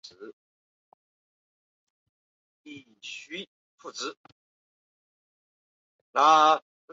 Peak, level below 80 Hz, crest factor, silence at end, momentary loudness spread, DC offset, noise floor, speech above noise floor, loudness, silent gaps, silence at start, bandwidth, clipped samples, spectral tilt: -6 dBFS; -88 dBFS; 24 dB; 0.35 s; 28 LU; under 0.1%; under -90 dBFS; over 65 dB; -23 LUFS; 0.33-2.65 s, 3.47-3.78 s, 4.17-4.24 s, 4.32-6.14 s; 0.2 s; 7.8 kHz; under 0.1%; -2 dB/octave